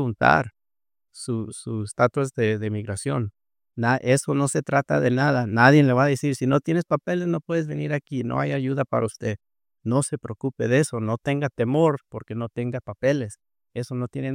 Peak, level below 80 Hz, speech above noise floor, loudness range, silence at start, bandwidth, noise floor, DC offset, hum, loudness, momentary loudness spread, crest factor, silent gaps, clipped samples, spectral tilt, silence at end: -2 dBFS; -60 dBFS; over 67 dB; 6 LU; 0 s; 15.5 kHz; under -90 dBFS; under 0.1%; none; -23 LUFS; 12 LU; 22 dB; none; under 0.1%; -6 dB/octave; 0 s